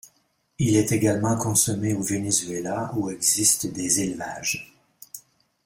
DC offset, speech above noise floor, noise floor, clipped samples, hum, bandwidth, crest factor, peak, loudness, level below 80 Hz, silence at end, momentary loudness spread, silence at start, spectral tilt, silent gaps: under 0.1%; 44 dB; -67 dBFS; under 0.1%; none; 16.5 kHz; 20 dB; -4 dBFS; -23 LUFS; -56 dBFS; 0.45 s; 11 LU; 0.6 s; -4 dB/octave; none